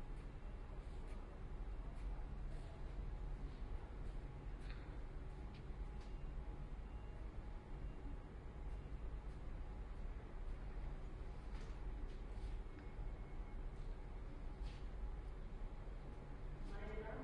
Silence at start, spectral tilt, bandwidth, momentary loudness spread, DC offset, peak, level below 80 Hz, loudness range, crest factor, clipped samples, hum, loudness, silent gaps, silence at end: 0 s; -7.5 dB/octave; 9.6 kHz; 3 LU; under 0.1%; -36 dBFS; -48 dBFS; 1 LU; 12 dB; under 0.1%; none; -54 LUFS; none; 0 s